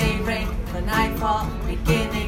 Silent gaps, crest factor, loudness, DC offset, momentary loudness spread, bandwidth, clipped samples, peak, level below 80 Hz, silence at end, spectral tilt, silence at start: none; 18 dB; -24 LUFS; under 0.1%; 6 LU; 16.5 kHz; under 0.1%; -6 dBFS; -28 dBFS; 0 s; -5.5 dB/octave; 0 s